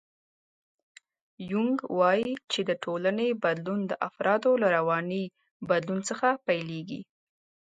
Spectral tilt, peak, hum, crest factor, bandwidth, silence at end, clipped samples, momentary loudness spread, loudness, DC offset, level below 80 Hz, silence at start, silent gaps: -5 dB/octave; -10 dBFS; none; 18 dB; 9.4 kHz; 0.75 s; under 0.1%; 12 LU; -28 LUFS; under 0.1%; -76 dBFS; 1.4 s; 5.51-5.60 s